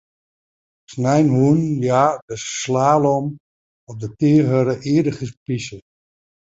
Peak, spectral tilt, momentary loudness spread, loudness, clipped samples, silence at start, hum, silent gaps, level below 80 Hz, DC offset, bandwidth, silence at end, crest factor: -2 dBFS; -6.5 dB/octave; 15 LU; -18 LUFS; under 0.1%; 0.9 s; none; 2.22-2.28 s, 3.40-3.87 s, 5.37-5.46 s; -56 dBFS; under 0.1%; 8 kHz; 0.7 s; 18 dB